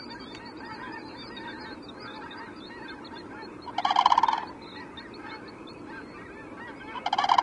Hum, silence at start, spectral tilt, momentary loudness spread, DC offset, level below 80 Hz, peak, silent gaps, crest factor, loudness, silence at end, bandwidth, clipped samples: none; 0 s; -3.5 dB/octave; 18 LU; under 0.1%; -64 dBFS; -4 dBFS; none; 26 dB; -32 LUFS; 0 s; 11 kHz; under 0.1%